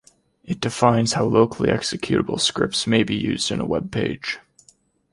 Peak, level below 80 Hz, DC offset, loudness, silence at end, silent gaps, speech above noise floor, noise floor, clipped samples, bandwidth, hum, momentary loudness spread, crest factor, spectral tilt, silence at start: -2 dBFS; -50 dBFS; under 0.1%; -21 LUFS; 0.75 s; none; 37 dB; -58 dBFS; under 0.1%; 11.5 kHz; none; 9 LU; 20 dB; -4.5 dB/octave; 0.45 s